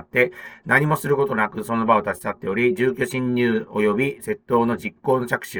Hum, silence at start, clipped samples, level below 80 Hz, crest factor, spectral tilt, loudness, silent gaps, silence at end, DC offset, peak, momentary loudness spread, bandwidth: none; 0.15 s; under 0.1%; -58 dBFS; 18 dB; -6 dB/octave; -21 LUFS; none; 0 s; under 0.1%; -4 dBFS; 6 LU; over 20 kHz